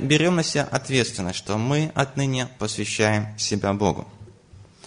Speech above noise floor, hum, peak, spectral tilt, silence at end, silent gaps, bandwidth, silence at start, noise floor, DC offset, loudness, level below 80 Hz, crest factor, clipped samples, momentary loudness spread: 26 dB; none; -2 dBFS; -4.5 dB/octave; 0.25 s; none; 10 kHz; 0 s; -49 dBFS; under 0.1%; -23 LUFS; -52 dBFS; 20 dB; under 0.1%; 7 LU